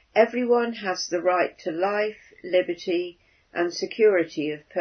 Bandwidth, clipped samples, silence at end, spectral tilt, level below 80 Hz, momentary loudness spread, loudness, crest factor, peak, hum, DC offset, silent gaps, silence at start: 6.6 kHz; under 0.1%; 0 s; -4 dB/octave; -70 dBFS; 9 LU; -25 LUFS; 20 dB; -4 dBFS; none; under 0.1%; none; 0.15 s